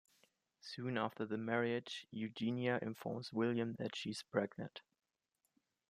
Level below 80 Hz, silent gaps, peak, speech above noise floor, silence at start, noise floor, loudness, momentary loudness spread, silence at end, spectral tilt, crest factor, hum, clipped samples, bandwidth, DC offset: -84 dBFS; none; -22 dBFS; 46 dB; 0.65 s; -87 dBFS; -41 LUFS; 11 LU; 1.1 s; -6 dB/octave; 20 dB; none; under 0.1%; 15 kHz; under 0.1%